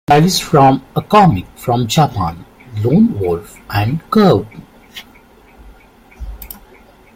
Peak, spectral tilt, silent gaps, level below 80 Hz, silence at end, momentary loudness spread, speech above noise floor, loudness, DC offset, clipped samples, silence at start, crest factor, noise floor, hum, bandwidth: 0 dBFS; -6 dB/octave; none; -38 dBFS; 0.7 s; 24 LU; 31 dB; -14 LUFS; under 0.1%; under 0.1%; 0.1 s; 14 dB; -44 dBFS; none; 16.5 kHz